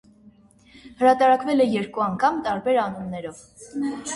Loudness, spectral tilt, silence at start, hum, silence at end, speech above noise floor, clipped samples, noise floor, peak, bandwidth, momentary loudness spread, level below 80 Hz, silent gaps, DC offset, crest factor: -22 LUFS; -5 dB/octave; 0.75 s; none; 0 s; 31 dB; under 0.1%; -53 dBFS; -6 dBFS; 11.5 kHz; 16 LU; -60 dBFS; none; under 0.1%; 18 dB